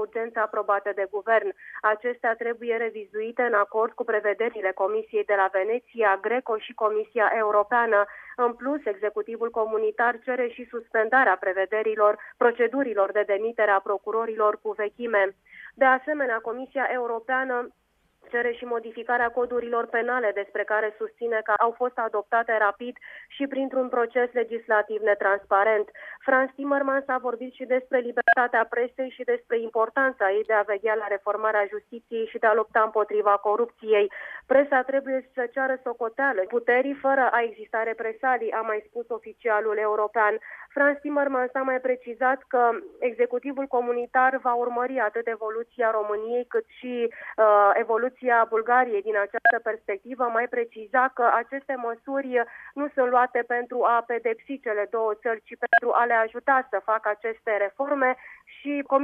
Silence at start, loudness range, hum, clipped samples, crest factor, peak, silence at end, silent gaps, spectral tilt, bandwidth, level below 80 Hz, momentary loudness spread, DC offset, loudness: 0 s; 3 LU; none; under 0.1%; 16 dB; -8 dBFS; 0 s; none; -6 dB/octave; 4.2 kHz; -72 dBFS; 9 LU; under 0.1%; -25 LUFS